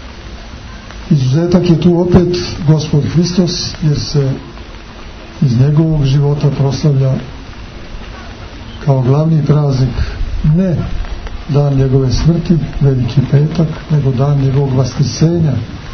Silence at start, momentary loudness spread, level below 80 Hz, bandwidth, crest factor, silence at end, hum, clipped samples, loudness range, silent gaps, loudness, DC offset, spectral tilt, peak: 0 s; 20 LU; -26 dBFS; 6.6 kHz; 12 dB; 0 s; none; under 0.1%; 3 LU; none; -13 LUFS; under 0.1%; -7.5 dB/octave; 0 dBFS